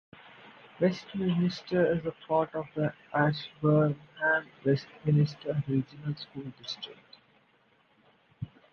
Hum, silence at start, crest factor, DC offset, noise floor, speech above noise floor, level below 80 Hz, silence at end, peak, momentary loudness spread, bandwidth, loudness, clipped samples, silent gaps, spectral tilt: none; 0.45 s; 20 dB; under 0.1%; -66 dBFS; 37 dB; -64 dBFS; 0.25 s; -12 dBFS; 13 LU; 6.8 kHz; -30 LUFS; under 0.1%; none; -8 dB/octave